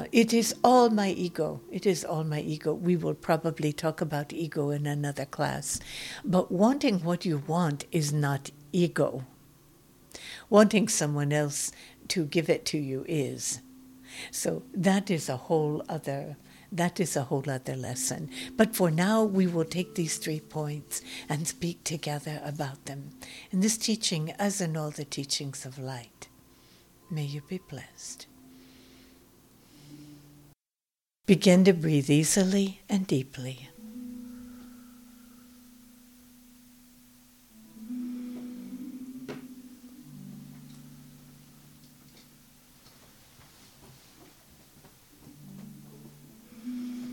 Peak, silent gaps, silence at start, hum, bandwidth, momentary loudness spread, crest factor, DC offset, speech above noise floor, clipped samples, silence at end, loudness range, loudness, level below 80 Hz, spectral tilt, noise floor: -6 dBFS; none; 0 s; none; 18 kHz; 22 LU; 24 dB; under 0.1%; over 62 dB; under 0.1%; 0 s; 19 LU; -28 LUFS; -64 dBFS; -5 dB/octave; under -90 dBFS